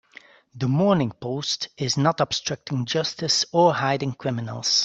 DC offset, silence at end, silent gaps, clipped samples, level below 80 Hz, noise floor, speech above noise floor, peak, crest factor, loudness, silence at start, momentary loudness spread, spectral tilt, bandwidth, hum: under 0.1%; 0 s; none; under 0.1%; -62 dBFS; -50 dBFS; 27 dB; -4 dBFS; 18 dB; -23 LUFS; 0.55 s; 9 LU; -4.5 dB/octave; 8.2 kHz; none